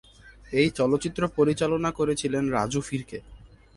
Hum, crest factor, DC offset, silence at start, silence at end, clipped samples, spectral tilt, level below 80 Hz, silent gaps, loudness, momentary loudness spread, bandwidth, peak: none; 16 dB; under 0.1%; 0.25 s; 0.35 s; under 0.1%; -5.5 dB/octave; -50 dBFS; none; -26 LUFS; 10 LU; 11.5 kHz; -10 dBFS